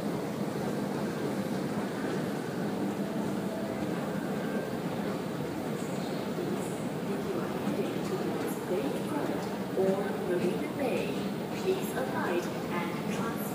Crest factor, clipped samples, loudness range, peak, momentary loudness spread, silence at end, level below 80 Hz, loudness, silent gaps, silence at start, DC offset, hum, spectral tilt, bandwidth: 16 dB; under 0.1%; 2 LU; -16 dBFS; 4 LU; 0 s; -66 dBFS; -33 LUFS; none; 0 s; under 0.1%; none; -6 dB/octave; 15.5 kHz